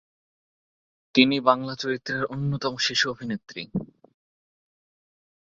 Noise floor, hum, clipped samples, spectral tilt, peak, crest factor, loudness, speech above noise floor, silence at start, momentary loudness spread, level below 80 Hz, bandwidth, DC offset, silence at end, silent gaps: under -90 dBFS; none; under 0.1%; -4.5 dB/octave; -2 dBFS; 26 dB; -25 LUFS; over 65 dB; 1.15 s; 13 LU; -62 dBFS; 7.8 kHz; under 0.1%; 1.65 s; none